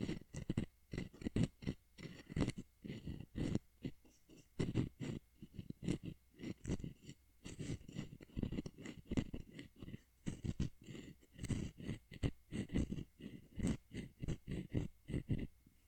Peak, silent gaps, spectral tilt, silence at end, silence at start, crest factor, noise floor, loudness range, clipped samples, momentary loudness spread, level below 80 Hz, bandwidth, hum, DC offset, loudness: -22 dBFS; none; -6.5 dB/octave; 0.2 s; 0 s; 22 dB; -65 dBFS; 3 LU; under 0.1%; 13 LU; -54 dBFS; 18.5 kHz; none; under 0.1%; -46 LUFS